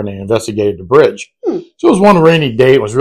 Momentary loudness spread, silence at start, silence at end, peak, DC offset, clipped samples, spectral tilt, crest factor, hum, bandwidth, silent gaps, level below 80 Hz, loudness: 12 LU; 0 s; 0 s; 0 dBFS; under 0.1%; 2%; -6 dB/octave; 10 dB; none; 13.5 kHz; none; -44 dBFS; -11 LUFS